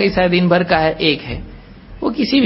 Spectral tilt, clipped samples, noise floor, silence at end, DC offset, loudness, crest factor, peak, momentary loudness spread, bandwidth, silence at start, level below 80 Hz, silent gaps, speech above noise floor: -9.5 dB/octave; under 0.1%; -36 dBFS; 0 s; under 0.1%; -16 LUFS; 16 dB; 0 dBFS; 12 LU; 5.8 kHz; 0 s; -36 dBFS; none; 21 dB